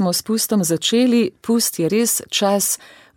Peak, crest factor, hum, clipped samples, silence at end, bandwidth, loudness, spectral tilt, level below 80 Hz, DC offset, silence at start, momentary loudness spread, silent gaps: -6 dBFS; 14 dB; none; under 0.1%; 0.4 s; 17.5 kHz; -18 LUFS; -3.5 dB/octave; -64 dBFS; under 0.1%; 0 s; 3 LU; none